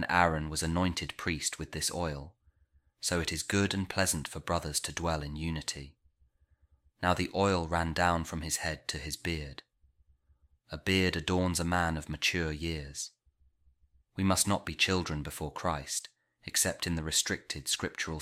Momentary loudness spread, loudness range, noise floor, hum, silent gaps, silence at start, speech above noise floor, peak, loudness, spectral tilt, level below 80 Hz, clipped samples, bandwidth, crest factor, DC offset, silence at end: 9 LU; 2 LU; -69 dBFS; none; none; 0 s; 37 dB; -8 dBFS; -32 LUFS; -3.5 dB/octave; -48 dBFS; under 0.1%; 16 kHz; 24 dB; under 0.1%; 0 s